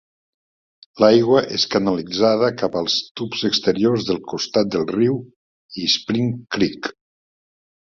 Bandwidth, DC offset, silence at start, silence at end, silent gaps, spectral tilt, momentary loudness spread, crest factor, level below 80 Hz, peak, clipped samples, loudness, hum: 7.4 kHz; under 0.1%; 0.95 s; 0.9 s; 3.11-3.15 s, 5.36-5.69 s; -5 dB/octave; 9 LU; 18 dB; -56 dBFS; -2 dBFS; under 0.1%; -19 LUFS; none